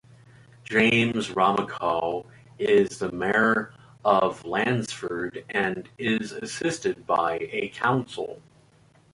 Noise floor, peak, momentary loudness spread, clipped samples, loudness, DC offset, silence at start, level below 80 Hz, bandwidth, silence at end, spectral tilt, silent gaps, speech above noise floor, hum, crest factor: -58 dBFS; -6 dBFS; 10 LU; under 0.1%; -25 LUFS; under 0.1%; 0.7 s; -60 dBFS; 11.5 kHz; 0.75 s; -5 dB/octave; none; 33 dB; none; 20 dB